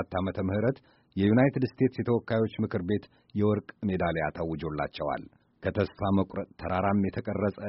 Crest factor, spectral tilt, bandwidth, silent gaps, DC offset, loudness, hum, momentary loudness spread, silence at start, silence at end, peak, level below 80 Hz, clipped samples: 18 dB; -7 dB/octave; 5.8 kHz; none; under 0.1%; -29 LUFS; none; 8 LU; 0 s; 0 s; -12 dBFS; -54 dBFS; under 0.1%